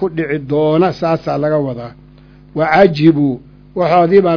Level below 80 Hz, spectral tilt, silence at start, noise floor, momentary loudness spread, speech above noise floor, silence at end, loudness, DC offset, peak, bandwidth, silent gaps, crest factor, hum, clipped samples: -46 dBFS; -8.5 dB/octave; 0 s; -41 dBFS; 17 LU; 28 dB; 0 s; -13 LUFS; under 0.1%; 0 dBFS; 5.4 kHz; none; 14 dB; 50 Hz at -40 dBFS; 0.3%